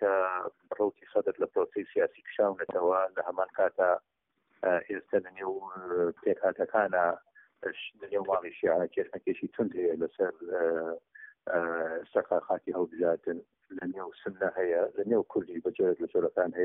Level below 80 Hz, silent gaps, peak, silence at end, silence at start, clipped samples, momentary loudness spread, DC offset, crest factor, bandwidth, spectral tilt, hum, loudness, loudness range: -74 dBFS; none; -12 dBFS; 0 s; 0 s; under 0.1%; 10 LU; under 0.1%; 18 dB; 3.8 kHz; -0.5 dB/octave; none; -31 LUFS; 2 LU